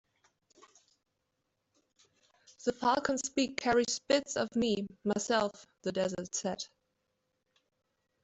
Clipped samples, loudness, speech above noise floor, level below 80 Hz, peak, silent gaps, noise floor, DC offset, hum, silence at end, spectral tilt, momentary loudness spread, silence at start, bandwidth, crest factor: under 0.1%; -33 LUFS; 50 dB; -68 dBFS; -14 dBFS; none; -82 dBFS; under 0.1%; none; 1.55 s; -3.5 dB/octave; 8 LU; 2.6 s; 8.2 kHz; 20 dB